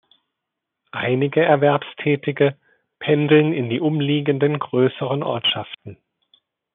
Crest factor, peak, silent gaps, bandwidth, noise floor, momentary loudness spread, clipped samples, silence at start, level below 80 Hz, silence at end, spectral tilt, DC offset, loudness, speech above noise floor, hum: 18 dB; -2 dBFS; none; 3.9 kHz; -82 dBFS; 10 LU; under 0.1%; 0.95 s; -70 dBFS; 0.8 s; -4.5 dB/octave; under 0.1%; -19 LUFS; 63 dB; none